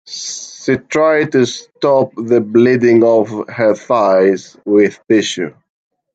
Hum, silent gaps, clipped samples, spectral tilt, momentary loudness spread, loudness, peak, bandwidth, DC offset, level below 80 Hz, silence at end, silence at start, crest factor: none; none; under 0.1%; -5 dB/octave; 12 LU; -14 LUFS; 0 dBFS; 8.6 kHz; under 0.1%; -60 dBFS; 0.65 s; 0.1 s; 14 dB